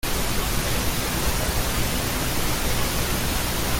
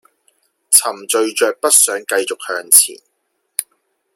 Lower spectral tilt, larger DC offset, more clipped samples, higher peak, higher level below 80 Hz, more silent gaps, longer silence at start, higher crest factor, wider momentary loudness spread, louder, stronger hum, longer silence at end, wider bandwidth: first, -3.5 dB/octave vs 1.5 dB/octave; neither; second, under 0.1% vs 0.2%; second, -10 dBFS vs 0 dBFS; first, -30 dBFS vs -68 dBFS; neither; second, 0.05 s vs 0.7 s; about the same, 14 dB vs 18 dB; second, 1 LU vs 15 LU; second, -24 LUFS vs -13 LUFS; first, 60 Hz at -30 dBFS vs none; second, 0 s vs 0.55 s; second, 17 kHz vs over 20 kHz